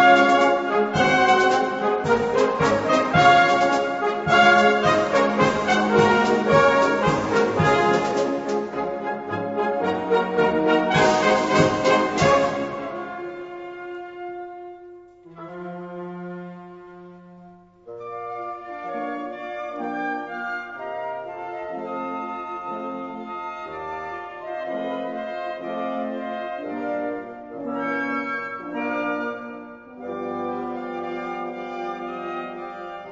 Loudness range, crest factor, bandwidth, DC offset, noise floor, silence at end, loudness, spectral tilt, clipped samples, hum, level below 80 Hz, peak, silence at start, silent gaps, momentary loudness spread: 18 LU; 20 dB; 8 kHz; under 0.1%; -48 dBFS; 0 s; -22 LUFS; -5 dB/octave; under 0.1%; none; -54 dBFS; -2 dBFS; 0 s; none; 18 LU